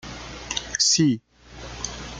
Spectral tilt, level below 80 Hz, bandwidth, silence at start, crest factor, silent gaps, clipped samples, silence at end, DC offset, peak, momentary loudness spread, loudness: -2.5 dB/octave; -46 dBFS; 11 kHz; 0.05 s; 20 dB; none; under 0.1%; 0 s; under 0.1%; -6 dBFS; 20 LU; -22 LUFS